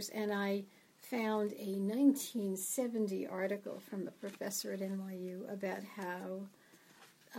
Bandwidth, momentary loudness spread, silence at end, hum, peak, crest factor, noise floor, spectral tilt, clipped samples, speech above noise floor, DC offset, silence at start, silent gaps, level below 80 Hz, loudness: 16 kHz; 13 LU; 0 s; none; -18 dBFS; 20 dB; -63 dBFS; -4.5 dB/octave; under 0.1%; 25 dB; under 0.1%; 0 s; none; under -90 dBFS; -38 LUFS